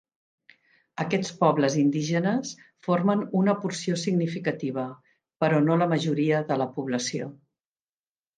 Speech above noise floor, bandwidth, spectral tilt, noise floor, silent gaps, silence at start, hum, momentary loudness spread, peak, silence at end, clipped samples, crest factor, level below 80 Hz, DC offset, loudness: over 65 dB; 9.6 kHz; -6 dB/octave; under -90 dBFS; none; 1 s; none; 11 LU; -6 dBFS; 1.05 s; under 0.1%; 20 dB; -72 dBFS; under 0.1%; -25 LUFS